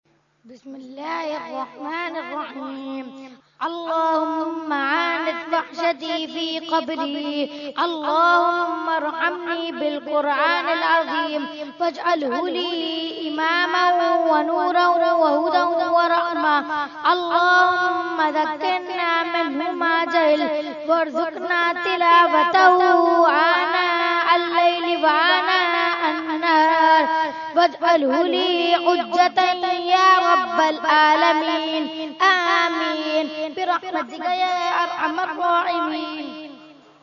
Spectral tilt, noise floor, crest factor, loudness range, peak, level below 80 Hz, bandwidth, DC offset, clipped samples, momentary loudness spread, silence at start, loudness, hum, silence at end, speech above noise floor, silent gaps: -2.5 dB/octave; -45 dBFS; 20 dB; 7 LU; 0 dBFS; -74 dBFS; 7.2 kHz; under 0.1%; under 0.1%; 12 LU; 0.45 s; -19 LUFS; none; 0.35 s; 25 dB; none